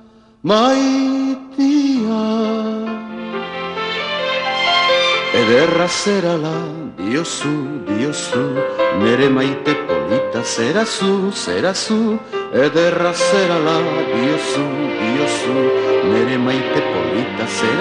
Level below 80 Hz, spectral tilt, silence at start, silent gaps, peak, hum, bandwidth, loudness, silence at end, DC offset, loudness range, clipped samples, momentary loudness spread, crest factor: -58 dBFS; -4.5 dB/octave; 0.45 s; none; -2 dBFS; none; 10.5 kHz; -17 LUFS; 0 s; under 0.1%; 3 LU; under 0.1%; 9 LU; 16 dB